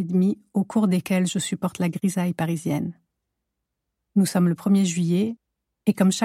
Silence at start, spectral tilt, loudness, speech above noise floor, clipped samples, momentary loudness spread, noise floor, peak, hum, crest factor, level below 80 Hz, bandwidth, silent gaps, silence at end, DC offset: 0 s; -6 dB/octave; -23 LUFS; 59 dB; under 0.1%; 7 LU; -81 dBFS; -8 dBFS; none; 16 dB; -68 dBFS; 15 kHz; none; 0 s; under 0.1%